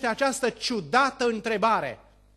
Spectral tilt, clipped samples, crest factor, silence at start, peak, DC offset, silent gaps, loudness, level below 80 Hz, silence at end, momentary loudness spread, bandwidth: -3 dB/octave; under 0.1%; 18 dB; 0 s; -8 dBFS; under 0.1%; none; -25 LUFS; -60 dBFS; 0.4 s; 5 LU; 13 kHz